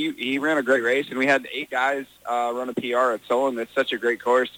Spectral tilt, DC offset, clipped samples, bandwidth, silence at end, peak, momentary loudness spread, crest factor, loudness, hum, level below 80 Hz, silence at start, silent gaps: -4 dB/octave; under 0.1%; under 0.1%; 17 kHz; 0.1 s; -8 dBFS; 6 LU; 16 dB; -23 LUFS; none; -70 dBFS; 0 s; none